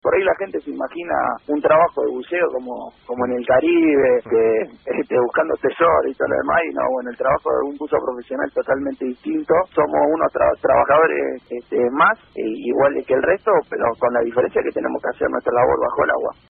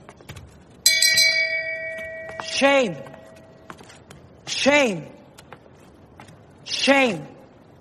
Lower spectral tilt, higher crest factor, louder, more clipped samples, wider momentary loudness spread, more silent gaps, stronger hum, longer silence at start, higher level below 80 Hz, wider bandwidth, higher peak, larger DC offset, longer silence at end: first, -4.5 dB/octave vs -1.5 dB/octave; second, 16 dB vs 24 dB; about the same, -19 LUFS vs -19 LUFS; neither; second, 10 LU vs 25 LU; neither; neither; about the same, 0.05 s vs 0.1 s; first, -52 dBFS vs -60 dBFS; second, 3.9 kHz vs 13 kHz; second, -4 dBFS vs 0 dBFS; neither; second, 0.15 s vs 0.45 s